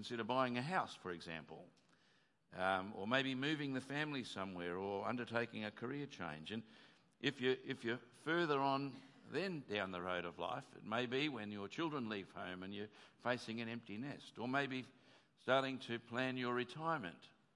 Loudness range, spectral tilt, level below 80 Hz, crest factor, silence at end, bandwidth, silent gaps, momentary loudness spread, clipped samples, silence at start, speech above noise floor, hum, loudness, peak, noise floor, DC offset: 3 LU; -5.5 dB/octave; -88 dBFS; 24 dB; 0.3 s; 11.5 kHz; none; 11 LU; under 0.1%; 0 s; 33 dB; none; -42 LUFS; -20 dBFS; -76 dBFS; under 0.1%